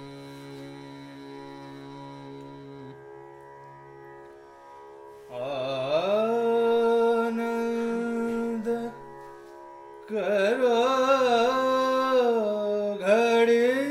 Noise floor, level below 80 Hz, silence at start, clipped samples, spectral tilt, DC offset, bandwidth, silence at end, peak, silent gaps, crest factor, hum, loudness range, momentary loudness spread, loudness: -48 dBFS; -68 dBFS; 0 s; under 0.1%; -5 dB/octave; under 0.1%; 13.5 kHz; 0 s; -10 dBFS; none; 16 dB; none; 21 LU; 24 LU; -25 LUFS